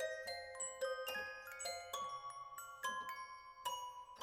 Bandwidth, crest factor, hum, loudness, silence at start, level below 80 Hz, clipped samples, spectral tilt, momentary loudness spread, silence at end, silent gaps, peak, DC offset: 19.5 kHz; 16 dB; none; -46 LUFS; 0 s; -80 dBFS; under 0.1%; 0.5 dB/octave; 7 LU; 0 s; none; -30 dBFS; under 0.1%